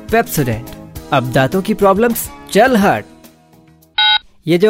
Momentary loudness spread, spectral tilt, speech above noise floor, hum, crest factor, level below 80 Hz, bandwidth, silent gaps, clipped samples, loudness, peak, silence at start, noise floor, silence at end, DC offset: 10 LU; -4.5 dB/octave; 34 dB; none; 14 dB; -40 dBFS; 16.5 kHz; none; under 0.1%; -14 LUFS; 0 dBFS; 0 s; -47 dBFS; 0 s; under 0.1%